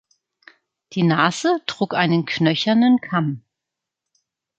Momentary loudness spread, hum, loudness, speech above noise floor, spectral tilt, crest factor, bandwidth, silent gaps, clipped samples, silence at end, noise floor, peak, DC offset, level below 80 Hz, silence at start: 8 LU; none; -19 LUFS; 65 dB; -5.5 dB/octave; 20 dB; 8.8 kHz; none; under 0.1%; 1.2 s; -84 dBFS; -2 dBFS; under 0.1%; -66 dBFS; 0.9 s